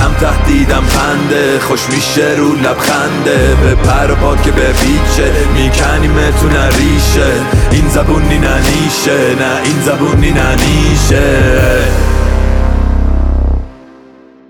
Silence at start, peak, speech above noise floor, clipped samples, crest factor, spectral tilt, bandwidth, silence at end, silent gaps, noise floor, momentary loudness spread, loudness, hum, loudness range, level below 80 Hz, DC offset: 0 s; 0 dBFS; 29 dB; under 0.1%; 8 dB; -5 dB/octave; 18 kHz; 0.75 s; none; -38 dBFS; 3 LU; -10 LUFS; none; 1 LU; -12 dBFS; under 0.1%